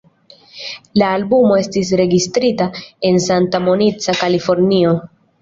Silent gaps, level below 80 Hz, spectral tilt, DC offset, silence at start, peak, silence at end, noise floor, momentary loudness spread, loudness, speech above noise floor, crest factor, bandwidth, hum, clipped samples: none; -52 dBFS; -5.5 dB/octave; under 0.1%; 0.55 s; -2 dBFS; 0.35 s; -47 dBFS; 8 LU; -15 LUFS; 33 dB; 14 dB; 7.8 kHz; none; under 0.1%